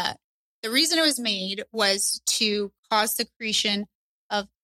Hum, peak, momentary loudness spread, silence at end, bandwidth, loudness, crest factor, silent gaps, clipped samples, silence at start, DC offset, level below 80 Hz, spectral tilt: none; -8 dBFS; 10 LU; 0.15 s; 16.5 kHz; -23 LUFS; 18 dB; 0.24-0.62 s, 2.78-2.83 s, 3.36-3.40 s, 3.95-4.30 s; under 0.1%; 0 s; under 0.1%; -66 dBFS; -1.5 dB/octave